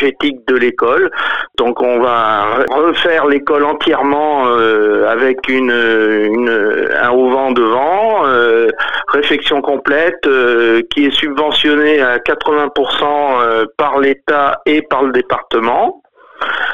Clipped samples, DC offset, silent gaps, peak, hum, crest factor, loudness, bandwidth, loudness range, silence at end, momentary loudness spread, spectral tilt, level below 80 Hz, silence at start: under 0.1%; 2%; none; -2 dBFS; none; 10 dB; -12 LUFS; 7.4 kHz; 1 LU; 0 s; 4 LU; -5 dB/octave; -50 dBFS; 0 s